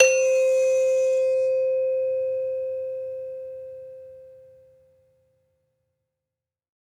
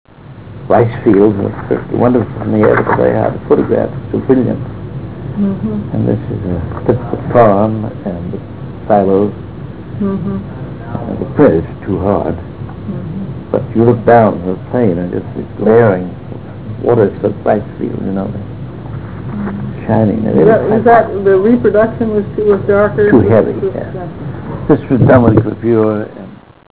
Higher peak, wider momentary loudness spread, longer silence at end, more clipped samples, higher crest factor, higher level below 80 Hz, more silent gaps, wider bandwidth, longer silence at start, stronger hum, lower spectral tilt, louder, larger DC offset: about the same, -2 dBFS vs 0 dBFS; first, 20 LU vs 16 LU; first, 2.6 s vs 0.4 s; neither; first, 22 dB vs 12 dB; second, -76 dBFS vs -34 dBFS; neither; first, 11.5 kHz vs 4 kHz; about the same, 0 s vs 0.1 s; neither; second, 0 dB/octave vs -12.5 dB/octave; second, -23 LUFS vs -13 LUFS; second, under 0.1% vs 1%